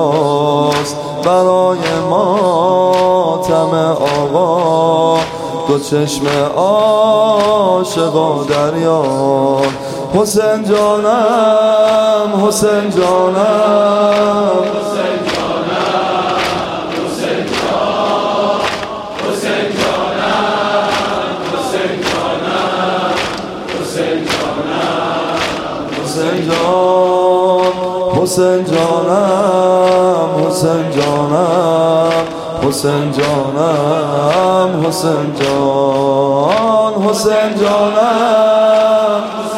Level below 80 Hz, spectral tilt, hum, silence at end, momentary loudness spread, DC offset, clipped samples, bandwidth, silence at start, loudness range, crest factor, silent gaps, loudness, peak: -46 dBFS; -5 dB/octave; none; 0 s; 6 LU; under 0.1%; under 0.1%; 16 kHz; 0 s; 5 LU; 12 dB; none; -13 LUFS; 0 dBFS